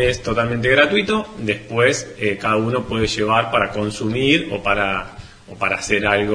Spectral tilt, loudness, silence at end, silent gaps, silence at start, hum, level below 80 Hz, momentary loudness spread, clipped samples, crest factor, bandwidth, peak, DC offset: -4.5 dB/octave; -18 LUFS; 0 s; none; 0 s; none; -40 dBFS; 7 LU; under 0.1%; 18 dB; 10.5 kHz; 0 dBFS; under 0.1%